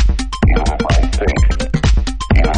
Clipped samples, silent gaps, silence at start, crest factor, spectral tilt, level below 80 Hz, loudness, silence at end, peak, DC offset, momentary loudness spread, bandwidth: under 0.1%; none; 0 s; 12 dB; -6 dB/octave; -14 dBFS; -16 LUFS; 0 s; 0 dBFS; under 0.1%; 2 LU; 9.8 kHz